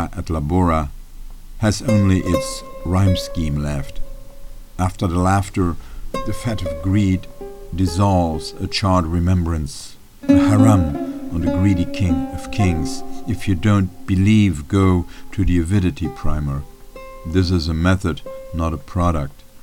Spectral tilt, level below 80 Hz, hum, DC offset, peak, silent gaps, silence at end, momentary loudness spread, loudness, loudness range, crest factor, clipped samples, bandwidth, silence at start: -7 dB/octave; -30 dBFS; none; under 0.1%; 0 dBFS; none; 0.05 s; 14 LU; -19 LUFS; 4 LU; 18 dB; under 0.1%; 16 kHz; 0 s